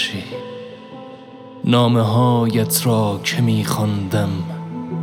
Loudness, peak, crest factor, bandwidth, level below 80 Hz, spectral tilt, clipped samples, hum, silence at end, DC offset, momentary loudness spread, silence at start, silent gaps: -18 LUFS; -4 dBFS; 14 dB; 17 kHz; -60 dBFS; -5.5 dB/octave; under 0.1%; none; 0 s; under 0.1%; 21 LU; 0 s; none